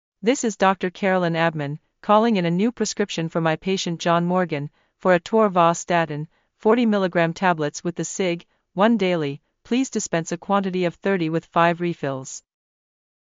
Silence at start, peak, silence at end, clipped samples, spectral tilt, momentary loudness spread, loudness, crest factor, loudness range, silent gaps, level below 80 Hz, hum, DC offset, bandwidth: 0.25 s; -4 dBFS; 0.85 s; under 0.1%; -5 dB/octave; 11 LU; -22 LUFS; 18 dB; 3 LU; none; -64 dBFS; none; under 0.1%; 7.8 kHz